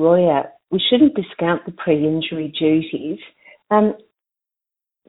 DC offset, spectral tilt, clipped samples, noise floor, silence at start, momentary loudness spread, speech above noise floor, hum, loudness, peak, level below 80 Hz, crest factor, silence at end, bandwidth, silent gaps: under 0.1%; -11 dB/octave; under 0.1%; -87 dBFS; 0 s; 12 LU; 70 dB; none; -18 LUFS; -2 dBFS; -58 dBFS; 18 dB; 1.1 s; 4.1 kHz; none